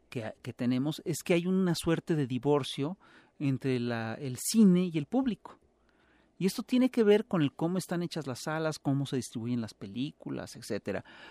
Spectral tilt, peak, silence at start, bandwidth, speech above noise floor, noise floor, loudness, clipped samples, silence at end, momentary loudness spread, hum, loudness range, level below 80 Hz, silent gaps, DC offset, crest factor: -6 dB/octave; -14 dBFS; 0.1 s; 15 kHz; 36 dB; -67 dBFS; -31 LUFS; under 0.1%; 0 s; 13 LU; none; 5 LU; -66 dBFS; none; under 0.1%; 18 dB